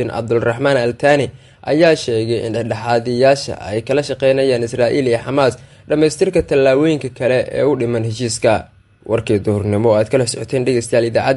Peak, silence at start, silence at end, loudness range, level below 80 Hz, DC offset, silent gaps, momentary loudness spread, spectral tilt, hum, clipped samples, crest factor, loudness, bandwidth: 0 dBFS; 0 s; 0 s; 2 LU; -46 dBFS; under 0.1%; none; 7 LU; -5.5 dB/octave; none; under 0.1%; 14 dB; -16 LUFS; 11.5 kHz